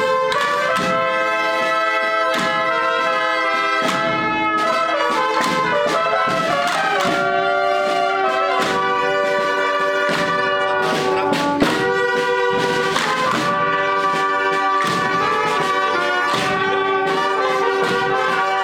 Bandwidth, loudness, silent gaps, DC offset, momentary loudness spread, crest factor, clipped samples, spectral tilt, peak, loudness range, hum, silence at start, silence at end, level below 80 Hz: 18 kHz; -18 LUFS; none; under 0.1%; 1 LU; 12 dB; under 0.1%; -3.5 dB/octave; -6 dBFS; 0 LU; none; 0 s; 0 s; -56 dBFS